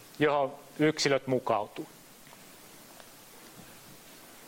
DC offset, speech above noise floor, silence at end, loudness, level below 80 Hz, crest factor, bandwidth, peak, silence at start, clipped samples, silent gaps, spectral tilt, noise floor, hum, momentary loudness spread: under 0.1%; 24 dB; 0 s; -29 LUFS; -70 dBFS; 20 dB; 16.5 kHz; -12 dBFS; 0.2 s; under 0.1%; none; -4.5 dB/octave; -53 dBFS; none; 23 LU